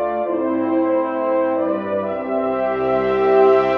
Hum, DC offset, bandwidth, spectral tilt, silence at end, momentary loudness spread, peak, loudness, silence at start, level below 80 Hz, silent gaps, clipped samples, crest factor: none; under 0.1%; 5.6 kHz; -8 dB/octave; 0 s; 8 LU; -4 dBFS; -19 LUFS; 0 s; -52 dBFS; none; under 0.1%; 14 dB